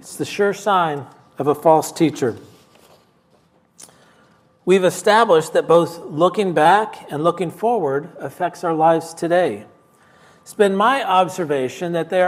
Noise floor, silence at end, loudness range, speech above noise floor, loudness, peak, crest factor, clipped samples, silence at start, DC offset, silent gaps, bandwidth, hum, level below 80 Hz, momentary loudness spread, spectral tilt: -57 dBFS; 0 s; 5 LU; 40 dB; -18 LUFS; 0 dBFS; 18 dB; under 0.1%; 0.05 s; under 0.1%; none; 16 kHz; none; -70 dBFS; 10 LU; -5 dB/octave